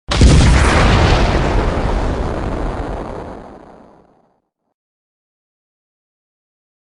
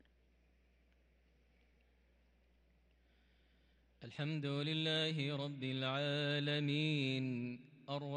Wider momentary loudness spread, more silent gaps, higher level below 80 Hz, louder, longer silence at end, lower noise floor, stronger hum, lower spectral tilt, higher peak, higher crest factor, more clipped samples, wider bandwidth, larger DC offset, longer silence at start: first, 17 LU vs 10 LU; neither; first, -20 dBFS vs -76 dBFS; first, -15 LUFS vs -39 LUFS; first, 3.35 s vs 0 s; second, -64 dBFS vs -72 dBFS; neither; about the same, -5.5 dB/octave vs -6 dB/octave; first, 0 dBFS vs -26 dBFS; about the same, 16 dB vs 16 dB; neither; first, 11.5 kHz vs 9.4 kHz; neither; second, 0.1 s vs 4 s